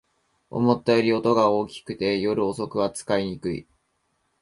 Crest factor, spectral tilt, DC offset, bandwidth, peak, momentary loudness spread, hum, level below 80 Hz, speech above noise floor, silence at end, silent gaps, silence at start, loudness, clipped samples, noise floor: 18 dB; -6 dB/octave; under 0.1%; 11.5 kHz; -6 dBFS; 12 LU; none; -58 dBFS; 49 dB; 0.8 s; none; 0.5 s; -24 LUFS; under 0.1%; -72 dBFS